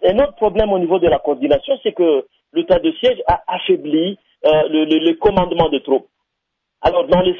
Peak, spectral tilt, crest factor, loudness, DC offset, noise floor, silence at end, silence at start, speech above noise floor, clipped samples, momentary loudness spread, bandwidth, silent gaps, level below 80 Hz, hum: -2 dBFS; -8 dB/octave; 14 dB; -16 LUFS; under 0.1%; -76 dBFS; 0 s; 0 s; 61 dB; under 0.1%; 6 LU; 6 kHz; none; -38 dBFS; none